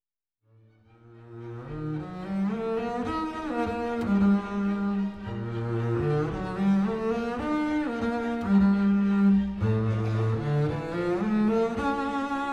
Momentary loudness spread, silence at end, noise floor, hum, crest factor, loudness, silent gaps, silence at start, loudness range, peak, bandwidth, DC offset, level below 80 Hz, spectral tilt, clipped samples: 11 LU; 0 s; -74 dBFS; none; 14 dB; -27 LUFS; none; 1.05 s; 7 LU; -12 dBFS; 8.6 kHz; under 0.1%; -50 dBFS; -8.5 dB/octave; under 0.1%